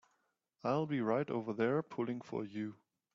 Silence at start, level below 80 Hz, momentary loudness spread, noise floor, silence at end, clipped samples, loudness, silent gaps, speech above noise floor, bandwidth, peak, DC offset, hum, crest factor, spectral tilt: 0.65 s; -80 dBFS; 8 LU; -81 dBFS; 0.4 s; under 0.1%; -38 LUFS; none; 44 dB; 7.6 kHz; -20 dBFS; under 0.1%; none; 18 dB; -8 dB/octave